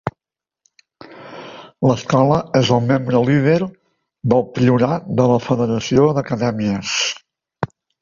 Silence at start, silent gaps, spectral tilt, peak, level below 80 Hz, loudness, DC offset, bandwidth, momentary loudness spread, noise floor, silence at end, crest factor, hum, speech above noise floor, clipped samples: 0.05 s; none; -6 dB/octave; -2 dBFS; -50 dBFS; -17 LUFS; under 0.1%; 7.4 kHz; 14 LU; -88 dBFS; 0.35 s; 16 dB; none; 72 dB; under 0.1%